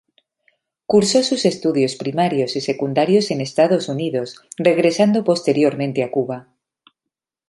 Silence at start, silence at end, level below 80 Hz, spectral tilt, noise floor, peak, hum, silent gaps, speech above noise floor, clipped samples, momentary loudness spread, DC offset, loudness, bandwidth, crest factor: 0.9 s; 1.05 s; -64 dBFS; -5 dB/octave; -83 dBFS; -2 dBFS; none; none; 66 dB; under 0.1%; 8 LU; under 0.1%; -18 LUFS; 11.5 kHz; 16 dB